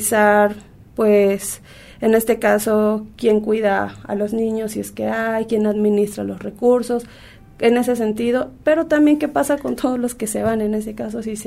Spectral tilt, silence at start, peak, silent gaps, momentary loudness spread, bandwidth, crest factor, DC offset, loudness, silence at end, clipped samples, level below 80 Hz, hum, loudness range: -5 dB/octave; 0 s; -2 dBFS; none; 10 LU; 16 kHz; 16 dB; under 0.1%; -19 LUFS; 0 s; under 0.1%; -48 dBFS; none; 2 LU